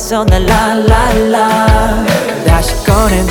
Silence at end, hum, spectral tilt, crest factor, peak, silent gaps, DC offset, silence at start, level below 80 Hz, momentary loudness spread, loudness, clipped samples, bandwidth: 0 s; none; -5.5 dB/octave; 10 dB; 0 dBFS; none; under 0.1%; 0 s; -16 dBFS; 2 LU; -10 LUFS; 0.4%; 19.5 kHz